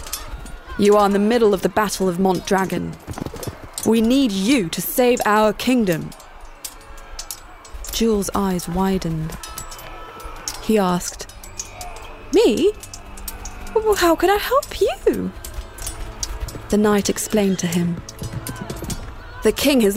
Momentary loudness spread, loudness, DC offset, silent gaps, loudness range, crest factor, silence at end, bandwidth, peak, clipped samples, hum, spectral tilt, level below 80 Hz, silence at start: 18 LU; -19 LUFS; under 0.1%; none; 5 LU; 16 dB; 0 s; 16 kHz; -4 dBFS; under 0.1%; none; -4.5 dB/octave; -36 dBFS; 0 s